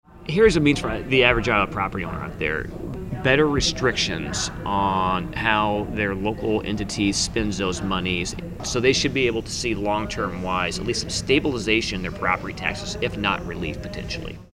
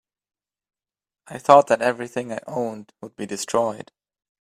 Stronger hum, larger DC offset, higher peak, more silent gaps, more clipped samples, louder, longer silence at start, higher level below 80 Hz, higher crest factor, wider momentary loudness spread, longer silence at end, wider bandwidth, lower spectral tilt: neither; neither; about the same, -2 dBFS vs 0 dBFS; neither; neither; about the same, -23 LUFS vs -21 LUFS; second, 0.15 s vs 1.3 s; first, -38 dBFS vs -68 dBFS; about the same, 20 dB vs 24 dB; second, 11 LU vs 23 LU; second, 0.1 s vs 0.65 s; about the same, 16 kHz vs 15 kHz; about the same, -4 dB/octave vs -4.5 dB/octave